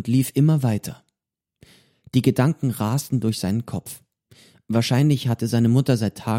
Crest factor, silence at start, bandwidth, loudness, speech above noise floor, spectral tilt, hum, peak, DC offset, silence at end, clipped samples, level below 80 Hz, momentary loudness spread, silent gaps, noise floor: 18 dB; 0 s; 16.5 kHz; -21 LUFS; 66 dB; -6.5 dB/octave; none; -4 dBFS; under 0.1%; 0 s; under 0.1%; -58 dBFS; 11 LU; none; -86 dBFS